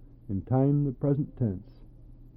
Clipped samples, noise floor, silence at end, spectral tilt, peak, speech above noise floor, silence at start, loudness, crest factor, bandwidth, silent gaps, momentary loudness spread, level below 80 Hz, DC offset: under 0.1%; -49 dBFS; 0.1 s; -14 dB/octave; -14 dBFS; 22 dB; 0 s; -28 LUFS; 16 dB; 2.4 kHz; none; 11 LU; -50 dBFS; under 0.1%